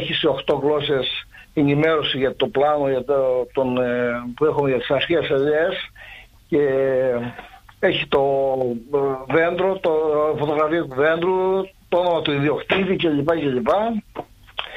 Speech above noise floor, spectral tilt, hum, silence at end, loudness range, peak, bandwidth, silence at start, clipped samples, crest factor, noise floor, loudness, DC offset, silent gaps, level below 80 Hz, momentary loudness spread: 23 dB; -7 dB/octave; none; 0 s; 1 LU; -6 dBFS; 8 kHz; 0 s; under 0.1%; 16 dB; -43 dBFS; -20 LUFS; under 0.1%; none; -50 dBFS; 7 LU